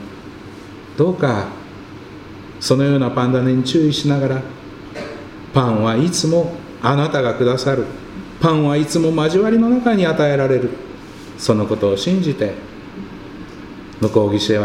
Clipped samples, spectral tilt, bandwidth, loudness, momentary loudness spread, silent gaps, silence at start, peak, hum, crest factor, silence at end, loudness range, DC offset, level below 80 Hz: under 0.1%; -6 dB/octave; 15.5 kHz; -17 LUFS; 20 LU; none; 0 s; 0 dBFS; none; 18 dB; 0 s; 4 LU; under 0.1%; -48 dBFS